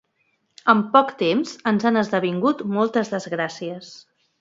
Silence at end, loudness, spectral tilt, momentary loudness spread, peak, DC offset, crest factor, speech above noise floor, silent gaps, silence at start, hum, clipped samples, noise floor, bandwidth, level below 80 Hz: 0.45 s; -21 LUFS; -6 dB/octave; 13 LU; -2 dBFS; under 0.1%; 20 dB; 48 dB; none; 0.65 s; none; under 0.1%; -69 dBFS; 7.8 kHz; -70 dBFS